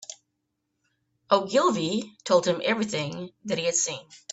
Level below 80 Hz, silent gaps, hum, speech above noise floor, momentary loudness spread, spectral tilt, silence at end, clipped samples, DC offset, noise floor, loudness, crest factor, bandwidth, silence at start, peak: -70 dBFS; none; none; 53 dB; 12 LU; -3.5 dB/octave; 0.15 s; under 0.1%; under 0.1%; -79 dBFS; -25 LUFS; 22 dB; 8.4 kHz; 0.1 s; -6 dBFS